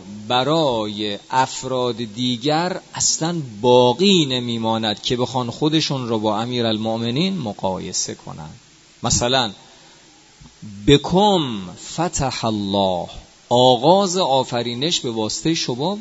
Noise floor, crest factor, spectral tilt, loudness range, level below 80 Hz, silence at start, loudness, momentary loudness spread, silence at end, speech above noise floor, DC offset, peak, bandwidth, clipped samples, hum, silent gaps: -49 dBFS; 20 dB; -4 dB/octave; 4 LU; -46 dBFS; 0 s; -19 LUFS; 10 LU; 0 s; 29 dB; under 0.1%; 0 dBFS; 8.2 kHz; under 0.1%; none; none